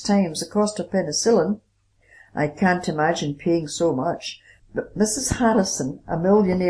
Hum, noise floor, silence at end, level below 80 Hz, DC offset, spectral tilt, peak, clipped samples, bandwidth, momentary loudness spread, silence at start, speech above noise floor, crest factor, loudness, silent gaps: none; -57 dBFS; 0 s; -48 dBFS; under 0.1%; -4.5 dB/octave; -6 dBFS; under 0.1%; 11 kHz; 12 LU; 0 s; 36 dB; 16 dB; -22 LUFS; none